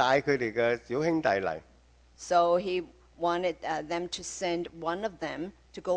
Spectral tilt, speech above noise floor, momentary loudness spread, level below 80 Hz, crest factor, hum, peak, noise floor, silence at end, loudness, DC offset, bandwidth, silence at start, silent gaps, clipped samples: -4.5 dB/octave; 30 dB; 13 LU; -60 dBFS; 20 dB; none; -10 dBFS; -59 dBFS; 0 s; -30 LUFS; under 0.1%; 10 kHz; 0 s; none; under 0.1%